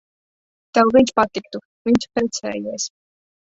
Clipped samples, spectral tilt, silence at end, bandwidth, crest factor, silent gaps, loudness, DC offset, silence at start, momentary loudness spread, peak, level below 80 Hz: under 0.1%; -4 dB/octave; 0.55 s; 8 kHz; 18 dB; 1.65-1.85 s; -19 LUFS; under 0.1%; 0.75 s; 14 LU; -2 dBFS; -52 dBFS